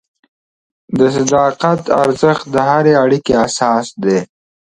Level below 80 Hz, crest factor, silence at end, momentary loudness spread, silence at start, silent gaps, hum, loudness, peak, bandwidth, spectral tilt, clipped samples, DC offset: -48 dBFS; 14 dB; 0.45 s; 5 LU; 0.9 s; none; none; -13 LUFS; 0 dBFS; 11.5 kHz; -5.5 dB/octave; under 0.1%; under 0.1%